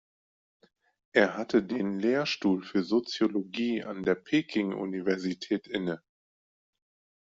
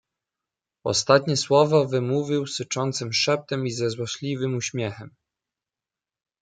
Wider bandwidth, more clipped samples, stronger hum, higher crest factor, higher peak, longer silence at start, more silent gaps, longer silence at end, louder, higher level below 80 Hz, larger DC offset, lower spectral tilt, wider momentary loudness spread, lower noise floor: second, 7.8 kHz vs 9.6 kHz; neither; neither; about the same, 24 dB vs 22 dB; second, -6 dBFS vs -2 dBFS; first, 1.15 s vs 0.85 s; neither; about the same, 1.25 s vs 1.35 s; second, -29 LUFS vs -23 LUFS; about the same, -70 dBFS vs -66 dBFS; neither; about the same, -5.5 dB/octave vs -4.5 dB/octave; second, 6 LU vs 10 LU; about the same, under -90 dBFS vs -90 dBFS